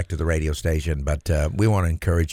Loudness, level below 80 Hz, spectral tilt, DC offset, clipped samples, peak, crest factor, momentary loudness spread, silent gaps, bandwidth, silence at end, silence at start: -23 LUFS; -28 dBFS; -6.5 dB/octave; under 0.1%; under 0.1%; -6 dBFS; 14 dB; 4 LU; none; 15.5 kHz; 0 s; 0 s